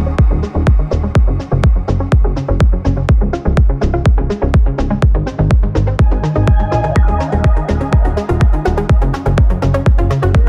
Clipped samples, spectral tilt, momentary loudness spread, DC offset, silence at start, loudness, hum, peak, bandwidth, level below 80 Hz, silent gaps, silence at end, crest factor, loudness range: under 0.1%; -8.5 dB/octave; 2 LU; under 0.1%; 0 s; -14 LUFS; none; -2 dBFS; 8.6 kHz; -14 dBFS; none; 0 s; 8 dB; 1 LU